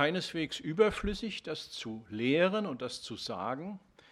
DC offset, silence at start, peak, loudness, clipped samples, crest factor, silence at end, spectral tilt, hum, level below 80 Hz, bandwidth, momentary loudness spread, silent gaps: under 0.1%; 0 s; -12 dBFS; -33 LUFS; under 0.1%; 22 dB; 0.35 s; -5 dB/octave; none; -54 dBFS; 13 kHz; 12 LU; none